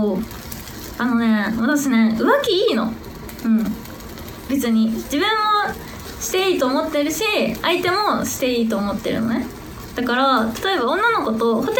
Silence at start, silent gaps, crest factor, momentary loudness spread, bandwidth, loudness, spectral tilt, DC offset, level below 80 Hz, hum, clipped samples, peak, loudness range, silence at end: 0 s; none; 16 dB; 15 LU; 19.5 kHz; -19 LUFS; -4 dB/octave; under 0.1%; -44 dBFS; none; under 0.1%; -2 dBFS; 2 LU; 0 s